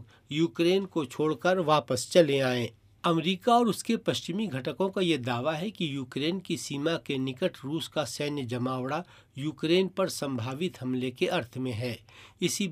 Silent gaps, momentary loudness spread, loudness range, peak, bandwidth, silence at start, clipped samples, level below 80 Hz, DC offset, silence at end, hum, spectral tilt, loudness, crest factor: none; 9 LU; 5 LU; -8 dBFS; 15.5 kHz; 0 s; under 0.1%; -70 dBFS; under 0.1%; 0 s; none; -5 dB/octave; -29 LUFS; 22 dB